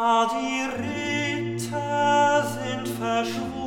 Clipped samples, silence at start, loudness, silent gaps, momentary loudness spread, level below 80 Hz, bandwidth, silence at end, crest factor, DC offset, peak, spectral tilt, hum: under 0.1%; 0 s; -24 LUFS; none; 9 LU; -58 dBFS; 18 kHz; 0 s; 14 dB; under 0.1%; -10 dBFS; -4.5 dB/octave; none